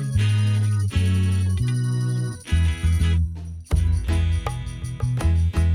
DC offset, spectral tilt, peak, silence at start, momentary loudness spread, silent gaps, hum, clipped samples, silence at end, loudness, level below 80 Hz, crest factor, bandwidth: under 0.1%; -6.5 dB/octave; -8 dBFS; 0 s; 7 LU; none; none; under 0.1%; 0 s; -23 LUFS; -28 dBFS; 14 dB; 12.5 kHz